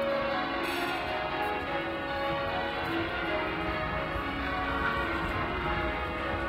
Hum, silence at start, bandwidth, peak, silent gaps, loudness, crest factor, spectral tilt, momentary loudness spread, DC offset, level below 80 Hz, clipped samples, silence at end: none; 0 s; 16 kHz; -18 dBFS; none; -31 LUFS; 14 dB; -5.5 dB/octave; 3 LU; under 0.1%; -44 dBFS; under 0.1%; 0 s